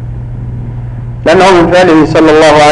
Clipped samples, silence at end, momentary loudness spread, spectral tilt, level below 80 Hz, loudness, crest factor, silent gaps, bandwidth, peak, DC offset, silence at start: under 0.1%; 0 s; 16 LU; -5.5 dB/octave; -26 dBFS; -5 LUFS; 6 dB; none; 11 kHz; 0 dBFS; under 0.1%; 0 s